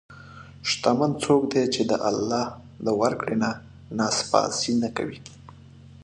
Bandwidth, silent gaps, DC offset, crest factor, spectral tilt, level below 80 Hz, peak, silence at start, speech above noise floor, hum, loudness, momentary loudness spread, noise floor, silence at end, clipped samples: 11 kHz; none; under 0.1%; 20 dB; -4 dB/octave; -58 dBFS; -4 dBFS; 0.1 s; 23 dB; none; -24 LUFS; 13 LU; -47 dBFS; 0 s; under 0.1%